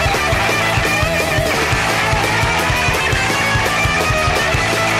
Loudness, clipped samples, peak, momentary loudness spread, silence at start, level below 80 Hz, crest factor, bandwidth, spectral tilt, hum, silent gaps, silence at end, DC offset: -15 LUFS; under 0.1%; -6 dBFS; 1 LU; 0 s; -28 dBFS; 10 dB; 16 kHz; -3.5 dB/octave; none; none; 0 s; under 0.1%